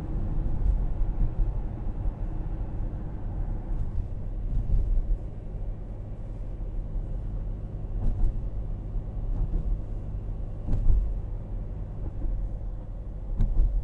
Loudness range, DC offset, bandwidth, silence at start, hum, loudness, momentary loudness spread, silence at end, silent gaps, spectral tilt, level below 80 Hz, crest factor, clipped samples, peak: 3 LU; under 0.1%; 2.2 kHz; 0 s; none; -34 LUFS; 8 LU; 0 s; none; -10.5 dB/octave; -28 dBFS; 18 dB; under 0.1%; -10 dBFS